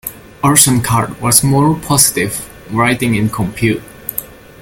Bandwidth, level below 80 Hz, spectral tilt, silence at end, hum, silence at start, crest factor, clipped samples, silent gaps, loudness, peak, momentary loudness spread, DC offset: over 20 kHz; -40 dBFS; -4 dB/octave; 0.25 s; none; 0.05 s; 14 dB; 0.2%; none; -13 LUFS; 0 dBFS; 14 LU; under 0.1%